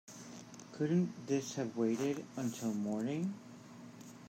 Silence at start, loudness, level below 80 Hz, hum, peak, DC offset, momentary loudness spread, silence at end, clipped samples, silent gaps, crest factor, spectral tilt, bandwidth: 0.05 s; -37 LUFS; -84 dBFS; none; -22 dBFS; under 0.1%; 18 LU; 0 s; under 0.1%; none; 16 dB; -6 dB/octave; 16 kHz